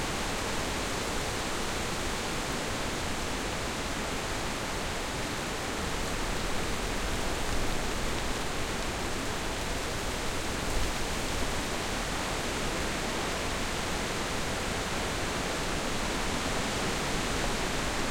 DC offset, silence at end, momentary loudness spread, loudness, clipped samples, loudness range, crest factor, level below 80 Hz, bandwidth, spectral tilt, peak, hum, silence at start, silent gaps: under 0.1%; 0 s; 2 LU; -32 LUFS; under 0.1%; 2 LU; 14 dB; -38 dBFS; 16.5 kHz; -3 dB/octave; -18 dBFS; none; 0 s; none